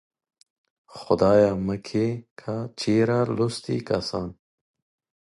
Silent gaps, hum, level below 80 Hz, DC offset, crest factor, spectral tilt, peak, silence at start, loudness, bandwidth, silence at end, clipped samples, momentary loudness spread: 2.31-2.36 s; none; -52 dBFS; under 0.1%; 20 dB; -6.5 dB/octave; -6 dBFS; 0.9 s; -24 LUFS; 11.5 kHz; 0.9 s; under 0.1%; 14 LU